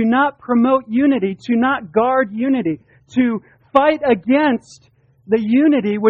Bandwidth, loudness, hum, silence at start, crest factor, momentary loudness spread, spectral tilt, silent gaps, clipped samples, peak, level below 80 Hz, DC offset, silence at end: 7.4 kHz; -17 LUFS; none; 0 s; 16 dB; 6 LU; -7 dB/octave; none; under 0.1%; 0 dBFS; -56 dBFS; under 0.1%; 0 s